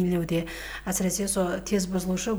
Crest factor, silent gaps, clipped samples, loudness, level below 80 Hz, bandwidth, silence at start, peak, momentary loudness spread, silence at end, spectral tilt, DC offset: 14 dB; none; under 0.1%; -27 LUFS; -46 dBFS; over 20 kHz; 0 s; -14 dBFS; 5 LU; 0 s; -4.5 dB/octave; under 0.1%